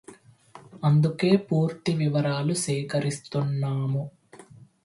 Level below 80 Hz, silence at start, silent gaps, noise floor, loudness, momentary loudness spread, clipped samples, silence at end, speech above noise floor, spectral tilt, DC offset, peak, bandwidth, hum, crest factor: -64 dBFS; 0.1 s; none; -51 dBFS; -25 LUFS; 7 LU; under 0.1%; 0.2 s; 27 dB; -6.5 dB/octave; under 0.1%; -8 dBFS; 11.5 kHz; none; 18 dB